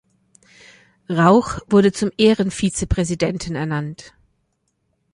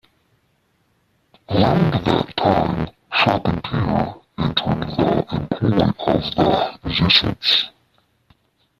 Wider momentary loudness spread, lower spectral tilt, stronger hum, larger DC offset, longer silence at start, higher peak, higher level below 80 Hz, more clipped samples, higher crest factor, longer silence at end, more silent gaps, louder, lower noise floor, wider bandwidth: first, 11 LU vs 8 LU; second, -5.5 dB/octave vs -7 dB/octave; neither; neither; second, 1.1 s vs 1.5 s; about the same, -2 dBFS vs -2 dBFS; about the same, -38 dBFS vs -42 dBFS; neither; about the same, 18 dB vs 20 dB; about the same, 1.05 s vs 1.1 s; neither; about the same, -18 LUFS vs -19 LUFS; first, -70 dBFS vs -64 dBFS; second, 11 kHz vs 13.5 kHz